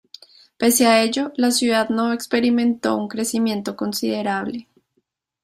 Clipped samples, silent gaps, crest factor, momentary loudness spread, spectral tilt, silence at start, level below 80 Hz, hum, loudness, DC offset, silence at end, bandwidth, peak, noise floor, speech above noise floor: under 0.1%; none; 18 dB; 9 LU; -3 dB/octave; 0.6 s; -64 dBFS; none; -20 LUFS; under 0.1%; 0.8 s; 16 kHz; -4 dBFS; -71 dBFS; 51 dB